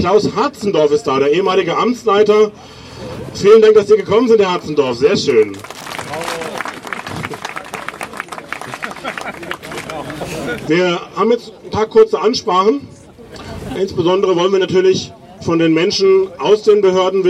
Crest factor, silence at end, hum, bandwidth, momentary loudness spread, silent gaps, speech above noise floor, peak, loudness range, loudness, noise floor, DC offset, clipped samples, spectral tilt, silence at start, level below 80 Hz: 14 dB; 0 s; none; 13 kHz; 15 LU; none; 23 dB; 0 dBFS; 12 LU; -14 LUFS; -35 dBFS; under 0.1%; under 0.1%; -5 dB/octave; 0 s; -48 dBFS